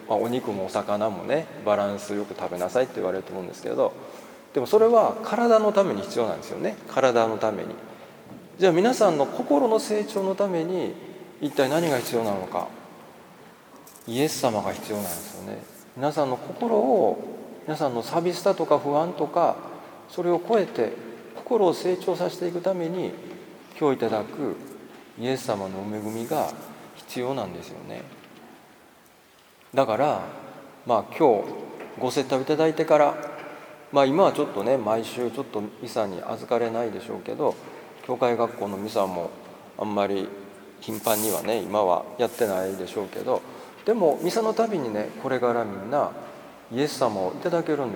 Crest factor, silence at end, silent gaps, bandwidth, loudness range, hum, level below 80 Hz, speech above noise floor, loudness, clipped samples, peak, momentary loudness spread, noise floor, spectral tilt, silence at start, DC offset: 20 dB; 0 s; none; over 20 kHz; 7 LU; none; -72 dBFS; 30 dB; -25 LUFS; under 0.1%; -4 dBFS; 19 LU; -55 dBFS; -5 dB/octave; 0 s; under 0.1%